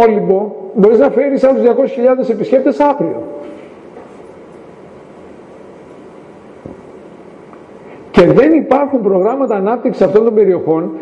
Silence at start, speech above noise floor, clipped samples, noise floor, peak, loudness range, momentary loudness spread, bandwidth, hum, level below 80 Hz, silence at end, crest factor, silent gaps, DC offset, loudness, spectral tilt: 0 s; 25 dB; under 0.1%; -36 dBFS; 0 dBFS; 13 LU; 16 LU; 8.2 kHz; none; -48 dBFS; 0 s; 14 dB; none; under 0.1%; -12 LUFS; -8.5 dB/octave